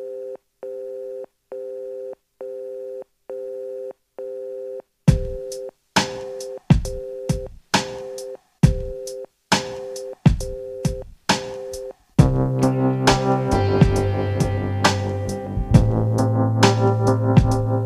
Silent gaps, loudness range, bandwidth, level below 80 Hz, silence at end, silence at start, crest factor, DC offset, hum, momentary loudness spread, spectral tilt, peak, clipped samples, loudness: none; 14 LU; 13.5 kHz; -32 dBFS; 0 s; 0 s; 20 dB; under 0.1%; none; 17 LU; -6 dB/octave; 0 dBFS; under 0.1%; -21 LUFS